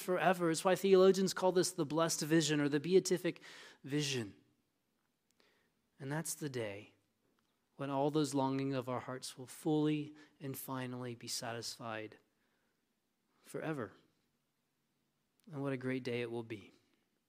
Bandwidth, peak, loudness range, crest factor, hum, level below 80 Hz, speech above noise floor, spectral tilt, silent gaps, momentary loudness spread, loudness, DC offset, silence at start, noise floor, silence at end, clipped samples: 16 kHz; -16 dBFS; 14 LU; 22 dB; none; -86 dBFS; 47 dB; -4.5 dB/octave; none; 18 LU; -36 LUFS; under 0.1%; 0 s; -83 dBFS; 0.6 s; under 0.1%